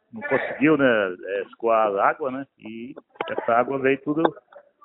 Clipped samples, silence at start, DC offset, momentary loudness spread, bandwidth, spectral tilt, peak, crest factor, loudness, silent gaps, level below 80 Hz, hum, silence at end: under 0.1%; 0.15 s; under 0.1%; 18 LU; 4.1 kHz; -10 dB/octave; -2 dBFS; 22 dB; -22 LUFS; none; -66 dBFS; none; 0.25 s